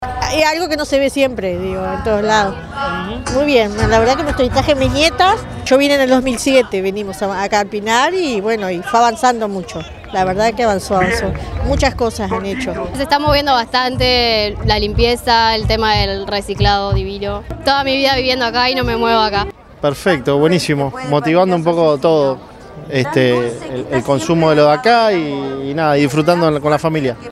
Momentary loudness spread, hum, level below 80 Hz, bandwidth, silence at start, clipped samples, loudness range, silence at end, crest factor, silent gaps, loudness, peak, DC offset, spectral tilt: 8 LU; none; -30 dBFS; 15 kHz; 0 s; under 0.1%; 3 LU; 0 s; 14 dB; none; -15 LUFS; 0 dBFS; under 0.1%; -5 dB/octave